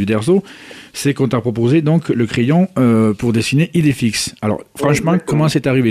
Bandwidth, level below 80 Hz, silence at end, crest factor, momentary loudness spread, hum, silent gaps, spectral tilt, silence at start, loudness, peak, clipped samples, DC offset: 15 kHz; -46 dBFS; 0 s; 12 dB; 7 LU; none; none; -6 dB/octave; 0 s; -15 LUFS; -4 dBFS; under 0.1%; under 0.1%